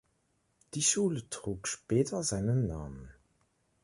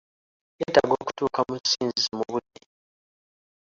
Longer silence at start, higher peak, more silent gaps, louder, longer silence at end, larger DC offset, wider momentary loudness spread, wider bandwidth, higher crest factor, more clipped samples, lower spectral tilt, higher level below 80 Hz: first, 0.75 s vs 0.6 s; second, -14 dBFS vs -4 dBFS; neither; second, -32 LUFS vs -25 LUFS; second, 0.7 s vs 1.3 s; neither; first, 15 LU vs 9 LU; first, 11.5 kHz vs 7.8 kHz; about the same, 20 dB vs 24 dB; neither; first, -4.5 dB/octave vs -3 dB/octave; first, -54 dBFS vs -62 dBFS